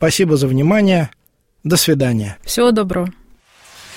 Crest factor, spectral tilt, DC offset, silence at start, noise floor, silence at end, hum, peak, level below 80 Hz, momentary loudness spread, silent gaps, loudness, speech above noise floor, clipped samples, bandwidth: 14 dB; -5 dB/octave; under 0.1%; 0 s; -47 dBFS; 0 s; none; -2 dBFS; -42 dBFS; 10 LU; none; -15 LUFS; 32 dB; under 0.1%; 16.5 kHz